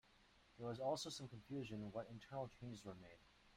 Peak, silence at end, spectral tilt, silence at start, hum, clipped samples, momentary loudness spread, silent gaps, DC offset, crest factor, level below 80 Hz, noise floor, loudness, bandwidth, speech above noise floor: -32 dBFS; 0 s; -5 dB/octave; 0.05 s; none; under 0.1%; 17 LU; none; under 0.1%; 20 dB; -76 dBFS; -73 dBFS; -50 LUFS; 15.5 kHz; 23 dB